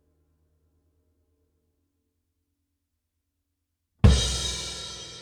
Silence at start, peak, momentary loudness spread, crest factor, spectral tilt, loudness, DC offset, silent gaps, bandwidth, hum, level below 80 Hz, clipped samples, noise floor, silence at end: 4.05 s; -4 dBFS; 15 LU; 26 dB; -4.5 dB/octave; -24 LUFS; under 0.1%; none; 13.5 kHz; none; -34 dBFS; under 0.1%; -80 dBFS; 0 s